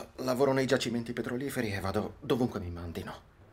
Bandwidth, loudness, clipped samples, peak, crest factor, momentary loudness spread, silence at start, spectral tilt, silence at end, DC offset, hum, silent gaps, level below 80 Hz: 16 kHz; -32 LUFS; under 0.1%; -14 dBFS; 18 dB; 13 LU; 0 s; -5.5 dB/octave; 0.1 s; under 0.1%; none; none; -58 dBFS